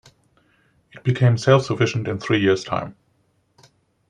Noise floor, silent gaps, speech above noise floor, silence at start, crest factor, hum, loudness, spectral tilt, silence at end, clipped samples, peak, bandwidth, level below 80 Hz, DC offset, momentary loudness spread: -65 dBFS; none; 46 dB; 0.95 s; 20 dB; none; -20 LUFS; -6.5 dB/octave; 1.15 s; under 0.1%; -2 dBFS; 9.6 kHz; -58 dBFS; under 0.1%; 10 LU